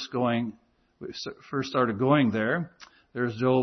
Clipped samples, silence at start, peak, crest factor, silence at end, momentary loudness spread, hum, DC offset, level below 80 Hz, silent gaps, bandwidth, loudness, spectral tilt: under 0.1%; 0 s; -10 dBFS; 18 dB; 0 s; 17 LU; none; under 0.1%; -68 dBFS; none; 6.4 kHz; -27 LUFS; -7 dB/octave